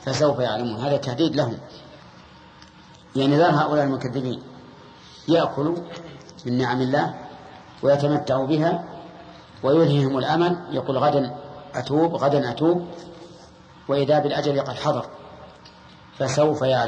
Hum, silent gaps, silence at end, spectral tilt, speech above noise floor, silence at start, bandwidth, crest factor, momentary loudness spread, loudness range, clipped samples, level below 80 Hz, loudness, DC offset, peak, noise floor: none; none; 0 s; -6.5 dB/octave; 27 dB; 0 s; 9.4 kHz; 16 dB; 21 LU; 4 LU; under 0.1%; -58 dBFS; -22 LUFS; under 0.1%; -6 dBFS; -48 dBFS